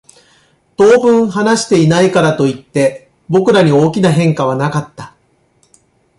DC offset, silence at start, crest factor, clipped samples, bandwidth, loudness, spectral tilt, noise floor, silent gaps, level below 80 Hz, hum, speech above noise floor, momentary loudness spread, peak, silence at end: under 0.1%; 0.8 s; 12 dB; under 0.1%; 11.5 kHz; -12 LUFS; -6 dB/octave; -56 dBFS; none; -50 dBFS; none; 45 dB; 7 LU; 0 dBFS; 1.1 s